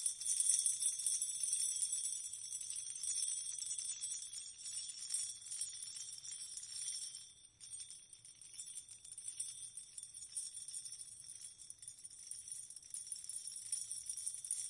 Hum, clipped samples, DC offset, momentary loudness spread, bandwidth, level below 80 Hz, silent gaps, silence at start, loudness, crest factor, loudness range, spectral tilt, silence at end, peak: none; under 0.1%; under 0.1%; 16 LU; 11.5 kHz; -84 dBFS; none; 0 s; -40 LUFS; 28 dB; 10 LU; 3.5 dB/octave; 0 s; -16 dBFS